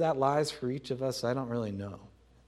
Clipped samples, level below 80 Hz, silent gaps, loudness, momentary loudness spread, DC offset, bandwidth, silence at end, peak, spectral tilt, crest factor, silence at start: under 0.1%; -64 dBFS; none; -32 LUFS; 13 LU; under 0.1%; 15.5 kHz; 0.4 s; -14 dBFS; -5.5 dB/octave; 18 dB; 0 s